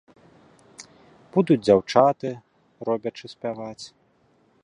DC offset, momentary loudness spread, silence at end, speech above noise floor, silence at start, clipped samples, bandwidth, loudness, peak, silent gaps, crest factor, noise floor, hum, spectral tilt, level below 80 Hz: under 0.1%; 24 LU; 0.75 s; 40 dB; 0.8 s; under 0.1%; 11 kHz; -23 LUFS; -2 dBFS; none; 22 dB; -62 dBFS; none; -6.5 dB/octave; -62 dBFS